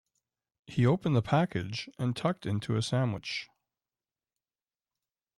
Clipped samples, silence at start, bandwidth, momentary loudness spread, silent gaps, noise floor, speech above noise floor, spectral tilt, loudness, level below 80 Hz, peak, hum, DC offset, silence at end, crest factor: under 0.1%; 0.7 s; 11.5 kHz; 10 LU; none; under -90 dBFS; over 61 dB; -6.5 dB/octave; -31 LUFS; -64 dBFS; -14 dBFS; none; under 0.1%; 1.9 s; 18 dB